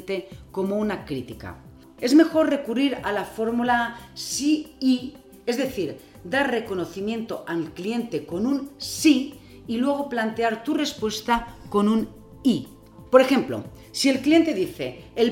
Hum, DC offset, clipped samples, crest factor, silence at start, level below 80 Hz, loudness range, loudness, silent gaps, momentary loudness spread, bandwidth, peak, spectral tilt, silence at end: none; under 0.1%; under 0.1%; 24 dB; 0 s; -54 dBFS; 5 LU; -24 LUFS; none; 14 LU; 17 kHz; 0 dBFS; -4.5 dB/octave; 0 s